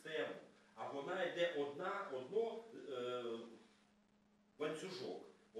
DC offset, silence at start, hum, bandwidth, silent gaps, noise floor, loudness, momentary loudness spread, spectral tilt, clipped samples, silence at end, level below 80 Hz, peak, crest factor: under 0.1%; 0 s; none; 12.5 kHz; none; -74 dBFS; -45 LUFS; 13 LU; -4.5 dB/octave; under 0.1%; 0 s; under -90 dBFS; -26 dBFS; 20 dB